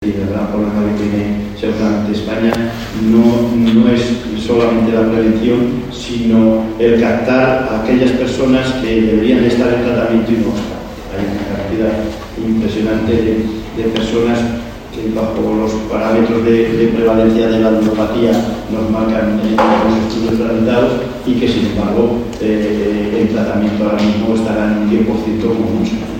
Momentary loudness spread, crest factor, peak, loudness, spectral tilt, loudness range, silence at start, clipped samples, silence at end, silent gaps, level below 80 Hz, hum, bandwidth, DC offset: 8 LU; 14 dB; 0 dBFS; -14 LUFS; -7 dB/octave; 4 LU; 0 s; under 0.1%; 0 s; none; -34 dBFS; none; 16 kHz; under 0.1%